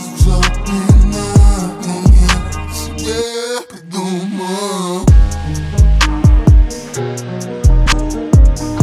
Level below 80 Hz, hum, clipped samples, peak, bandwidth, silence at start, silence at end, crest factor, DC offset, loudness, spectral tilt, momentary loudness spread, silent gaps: -14 dBFS; none; under 0.1%; 0 dBFS; 13 kHz; 0 s; 0 s; 12 dB; under 0.1%; -14 LUFS; -5.5 dB/octave; 11 LU; none